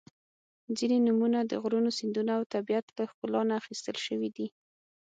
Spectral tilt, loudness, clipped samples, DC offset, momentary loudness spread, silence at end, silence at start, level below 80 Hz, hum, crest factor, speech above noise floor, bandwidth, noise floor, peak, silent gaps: -5 dB/octave; -31 LUFS; under 0.1%; under 0.1%; 11 LU; 0.6 s; 0.7 s; -80 dBFS; none; 16 dB; over 60 dB; 9 kHz; under -90 dBFS; -16 dBFS; 2.46-2.50 s, 2.83-2.88 s, 3.14-3.22 s